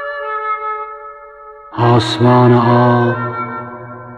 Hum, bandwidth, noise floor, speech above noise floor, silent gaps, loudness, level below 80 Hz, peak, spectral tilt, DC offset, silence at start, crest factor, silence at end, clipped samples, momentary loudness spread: none; 9.2 kHz; -36 dBFS; 26 dB; none; -13 LUFS; -52 dBFS; -2 dBFS; -7.5 dB/octave; under 0.1%; 0 s; 12 dB; 0 s; under 0.1%; 19 LU